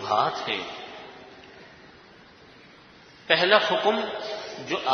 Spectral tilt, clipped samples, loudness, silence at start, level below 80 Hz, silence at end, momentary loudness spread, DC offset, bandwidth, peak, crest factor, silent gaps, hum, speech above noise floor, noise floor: -3.5 dB/octave; under 0.1%; -24 LUFS; 0 s; -68 dBFS; 0 s; 27 LU; under 0.1%; 6.6 kHz; -2 dBFS; 26 dB; none; none; 27 dB; -51 dBFS